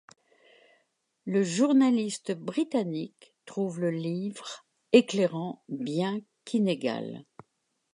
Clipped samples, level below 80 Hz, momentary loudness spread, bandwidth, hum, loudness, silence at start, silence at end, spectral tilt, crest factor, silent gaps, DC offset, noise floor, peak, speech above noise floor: under 0.1%; -80 dBFS; 18 LU; 11 kHz; none; -28 LUFS; 1.25 s; 0.7 s; -5.5 dB/octave; 24 dB; none; under 0.1%; -78 dBFS; -6 dBFS; 50 dB